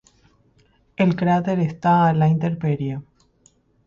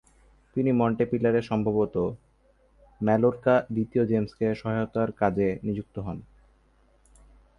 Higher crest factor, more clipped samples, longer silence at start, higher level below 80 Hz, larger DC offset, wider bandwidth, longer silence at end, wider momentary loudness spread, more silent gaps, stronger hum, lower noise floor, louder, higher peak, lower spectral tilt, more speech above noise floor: about the same, 14 dB vs 18 dB; neither; first, 1 s vs 0.55 s; about the same, -56 dBFS vs -54 dBFS; neither; about the same, 7.4 kHz vs 6.8 kHz; second, 0.85 s vs 1.35 s; about the same, 11 LU vs 11 LU; neither; neither; about the same, -59 dBFS vs -62 dBFS; first, -20 LUFS vs -26 LUFS; about the same, -6 dBFS vs -8 dBFS; about the same, -9 dB/octave vs -9.5 dB/octave; about the same, 40 dB vs 37 dB